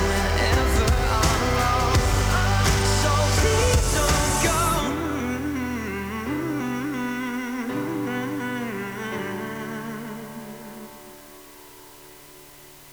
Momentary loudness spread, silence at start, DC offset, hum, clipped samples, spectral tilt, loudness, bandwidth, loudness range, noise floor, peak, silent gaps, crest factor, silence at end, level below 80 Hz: 23 LU; 0 s; under 0.1%; none; under 0.1%; -4.5 dB/octave; -23 LUFS; over 20 kHz; 14 LU; -46 dBFS; -8 dBFS; none; 16 dB; 0 s; -30 dBFS